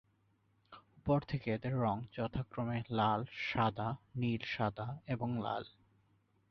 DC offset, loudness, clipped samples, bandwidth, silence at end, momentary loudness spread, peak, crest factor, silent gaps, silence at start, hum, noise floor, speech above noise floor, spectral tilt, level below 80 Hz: under 0.1%; -37 LUFS; under 0.1%; 6.4 kHz; 0.85 s; 7 LU; -18 dBFS; 20 dB; none; 0.7 s; none; -74 dBFS; 38 dB; -5.5 dB/octave; -62 dBFS